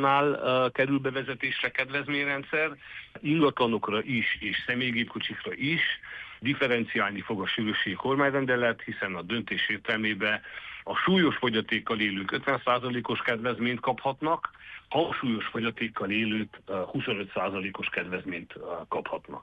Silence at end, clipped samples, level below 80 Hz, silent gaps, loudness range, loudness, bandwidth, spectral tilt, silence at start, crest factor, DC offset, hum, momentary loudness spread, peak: 0 s; under 0.1%; -62 dBFS; none; 3 LU; -28 LUFS; 8.2 kHz; -7 dB/octave; 0 s; 18 dB; under 0.1%; none; 8 LU; -12 dBFS